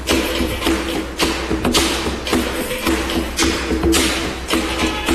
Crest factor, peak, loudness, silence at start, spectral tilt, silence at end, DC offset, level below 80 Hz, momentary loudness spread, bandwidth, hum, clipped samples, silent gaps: 18 dB; -2 dBFS; -18 LUFS; 0 s; -3.5 dB/octave; 0 s; under 0.1%; -28 dBFS; 5 LU; 14 kHz; none; under 0.1%; none